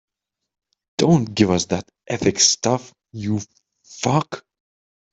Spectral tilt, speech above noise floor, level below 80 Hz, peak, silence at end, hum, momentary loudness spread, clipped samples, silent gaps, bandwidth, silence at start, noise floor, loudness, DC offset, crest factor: -4 dB/octave; over 70 dB; -56 dBFS; 0 dBFS; 0.75 s; none; 17 LU; under 0.1%; none; 8.4 kHz; 1 s; under -90 dBFS; -20 LUFS; under 0.1%; 22 dB